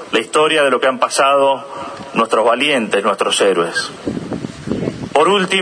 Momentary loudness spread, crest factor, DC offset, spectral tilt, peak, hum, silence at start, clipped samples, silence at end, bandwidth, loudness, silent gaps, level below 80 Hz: 12 LU; 16 dB; under 0.1%; -3.5 dB/octave; 0 dBFS; none; 0 s; under 0.1%; 0 s; 11 kHz; -15 LUFS; none; -50 dBFS